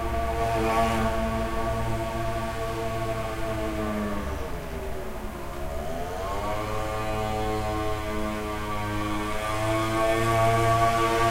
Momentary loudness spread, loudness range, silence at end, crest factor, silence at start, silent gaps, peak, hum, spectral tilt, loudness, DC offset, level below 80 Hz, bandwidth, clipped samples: 12 LU; 6 LU; 0 s; 16 dB; 0 s; none; -10 dBFS; none; -5.5 dB/octave; -28 LUFS; under 0.1%; -36 dBFS; 16 kHz; under 0.1%